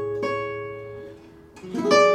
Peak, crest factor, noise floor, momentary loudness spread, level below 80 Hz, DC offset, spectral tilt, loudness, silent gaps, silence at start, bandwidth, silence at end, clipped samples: -4 dBFS; 20 dB; -46 dBFS; 23 LU; -60 dBFS; under 0.1%; -4 dB/octave; -25 LUFS; none; 0 s; 12 kHz; 0 s; under 0.1%